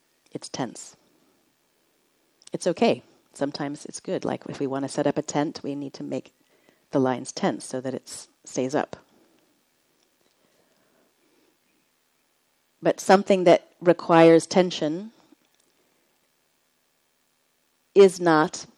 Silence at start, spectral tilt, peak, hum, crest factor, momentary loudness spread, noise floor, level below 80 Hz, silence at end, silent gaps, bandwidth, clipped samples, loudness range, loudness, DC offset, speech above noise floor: 0.4 s; -5 dB/octave; -2 dBFS; none; 24 dB; 19 LU; -69 dBFS; -74 dBFS; 0.15 s; none; 12.5 kHz; under 0.1%; 14 LU; -23 LUFS; under 0.1%; 47 dB